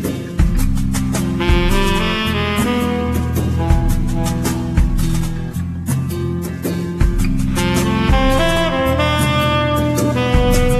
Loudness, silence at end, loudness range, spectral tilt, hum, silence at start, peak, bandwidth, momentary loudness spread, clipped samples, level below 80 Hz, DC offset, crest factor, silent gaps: -17 LUFS; 0 s; 4 LU; -5.5 dB/octave; none; 0 s; 0 dBFS; 14 kHz; 7 LU; under 0.1%; -20 dBFS; under 0.1%; 16 dB; none